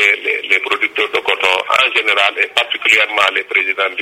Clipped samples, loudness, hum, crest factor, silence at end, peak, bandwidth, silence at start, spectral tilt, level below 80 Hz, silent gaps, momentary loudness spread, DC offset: under 0.1%; -13 LUFS; none; 14 dB; 0 s; 0 dBFS; 17 kHz; 0 s; 0 dB/octave; -62 dBFS; none; 4 LU; under 0.1%